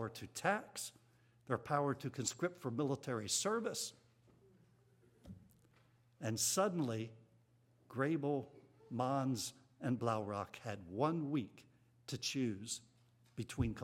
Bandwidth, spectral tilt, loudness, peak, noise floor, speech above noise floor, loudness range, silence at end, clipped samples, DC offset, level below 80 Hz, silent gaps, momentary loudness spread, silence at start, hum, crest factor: 16 kHz; -4.5 dB/octave; -40 LUFS; -20 dBFS; -71 dBFS; 32 dB; 3 LU; 0 s; under 0.1%; under 0.1%; -66 dBFS; none; 13 LU; 0 s; none; 22 dB